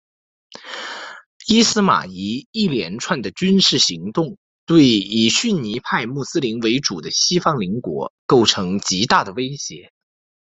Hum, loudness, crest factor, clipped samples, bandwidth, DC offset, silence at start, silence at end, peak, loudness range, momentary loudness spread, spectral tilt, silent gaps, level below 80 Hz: none; -18 LUFS; 18 dB; under 0.1%; 8.4 kHz; under 0.1%; 0.65 s; 0.65 s; 0 dBFS; 3 LU; 15 LU; -3.5 dB/octave; 1.26-1.40 s, 2.46-2.53 s, 4.37-4.67 s, 8.10-8.29 s; -56 dBFS